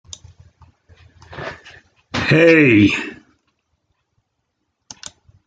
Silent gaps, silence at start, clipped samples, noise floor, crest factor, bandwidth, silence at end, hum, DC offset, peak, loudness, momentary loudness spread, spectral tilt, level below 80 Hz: none; 1.3 s; under 0.1%; -73 dBFS; 18 dB; 9 kHz; 2.35 s; none; under 0.1%; -2 dBFS; -13 LUFS; 28 LU; -6 dB/octave; -54 dBFS